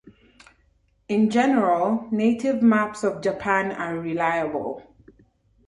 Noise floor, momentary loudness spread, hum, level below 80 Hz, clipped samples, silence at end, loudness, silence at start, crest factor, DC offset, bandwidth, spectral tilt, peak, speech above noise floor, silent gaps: -63 dBFS; 9 LU; none; -60 dBFS; under 0.1%; 0.9 s; -22 LUFS; 0.05 s; 18 dB; under 0.1%; 10.5 kHz; -6.5 dB/octave; -6 dBFS; 41 dB; none